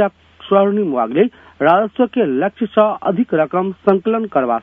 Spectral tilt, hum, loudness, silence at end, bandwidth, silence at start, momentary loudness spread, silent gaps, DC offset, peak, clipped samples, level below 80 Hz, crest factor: -9.5 dB/octave; none; -16 LUFS; 0 s; 3.8 kHz; 0 s; 4 LU; none; under 0.1%; 0 dBFS; under 0.1%; -62 dBFS; 16 dB